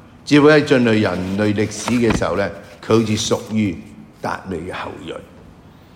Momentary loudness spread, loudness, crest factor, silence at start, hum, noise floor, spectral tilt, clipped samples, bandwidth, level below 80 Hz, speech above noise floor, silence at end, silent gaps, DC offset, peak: 17 LU; -17 LUFS; 18 dB; 0.25 s; none; -43 dBFS; -5.5 dB/octave; under 0.1%; 16 kHz; -44 dBFS; 26 dB; 0.45 s; none; under 0.1%; 0 dBFS